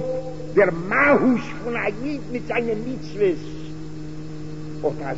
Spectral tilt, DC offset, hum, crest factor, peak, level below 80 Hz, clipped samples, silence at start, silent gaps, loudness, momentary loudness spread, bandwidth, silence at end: -7 dB/octave; 2%; none; 18 dB; -4 dBFS; -46 dBFS; under 0.1%; 0 s; none; -22 LUFS; 18 LU; 8 kHz; 0 s